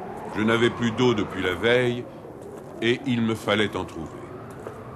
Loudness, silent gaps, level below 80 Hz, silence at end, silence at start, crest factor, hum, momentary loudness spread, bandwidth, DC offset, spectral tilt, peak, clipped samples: -24 LUFS; none; -54 dBFS; 0 s; 0 s; 18 dB; none; 18 LU; 13 kHz; under 0.1%; -5.5 dB/octave; -6 dBFS; under 0.1%